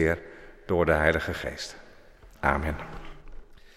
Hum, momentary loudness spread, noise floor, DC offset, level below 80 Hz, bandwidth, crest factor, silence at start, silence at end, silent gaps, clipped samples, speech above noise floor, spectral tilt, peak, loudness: none; 24 LU; -51 dBFS; under 0.1%; -40 dBFS; 14 kHz; 22 dB; 0 s; 0.2 s; none; under 0.1%; 25 dB; -6 dB/octave; -6 dBFS; -27 LUFS